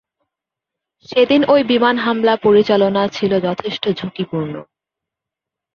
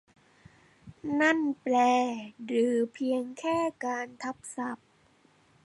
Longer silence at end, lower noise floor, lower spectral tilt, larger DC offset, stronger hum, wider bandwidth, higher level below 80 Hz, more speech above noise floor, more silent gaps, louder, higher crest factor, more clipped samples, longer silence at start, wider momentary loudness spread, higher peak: first, 1.1 s vs 0.9 s; first, -84 dBFS vs -64 dBFS; first, -6.5 dB/octave vs -4 dB/octave; neither; neither; second, 6.8 kHz vs 11.5 kHz; first, -58 dBFS vs -72 dBFS; first, 69 dB vs 35 dB; neither; first, -16 LUFS vs -29 LUFS; about the same, 16 dB vs 18 dB; neither; first, 1.1 s vs 0.85 s; about the same, 11 LU vs 13 LU; first, -2 dBFS vs -12 dBFS